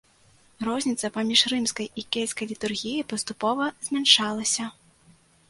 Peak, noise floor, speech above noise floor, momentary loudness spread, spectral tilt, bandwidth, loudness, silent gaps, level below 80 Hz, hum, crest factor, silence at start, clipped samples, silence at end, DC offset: -4 dBFS; -59 dBFS; 33 dB; 12 LU; -1.5 dB/octave; 11.5 kHz; -24 LUFS; none; -66 dBFS; none; 24 dB; 0.6 s; under 0.1%; 0.8 s; under 0.1%